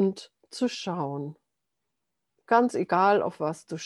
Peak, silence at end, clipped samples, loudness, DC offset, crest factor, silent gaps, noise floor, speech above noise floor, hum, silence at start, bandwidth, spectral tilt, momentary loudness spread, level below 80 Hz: -8 dBFS; 0 s; under 0.1%; -26 LUFS; under 0.1%; 20 dB; none; -84 dBFS; 58 dB; none; 0 s; 12 kHz; -5.5 dB/octave; 16 LU; -78 dBFS